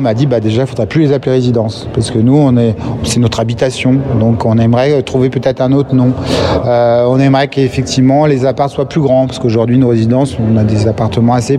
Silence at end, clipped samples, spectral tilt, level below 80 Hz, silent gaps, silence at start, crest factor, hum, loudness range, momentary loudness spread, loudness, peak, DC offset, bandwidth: 0 s; under 0.1%; -7 dB/octave; -38 dBFS; none; 0 s; 10 dB; none; 1 LU; 5 LU; -11 LUFS; 0 dBFS; under 0.1%; 11.5 kHz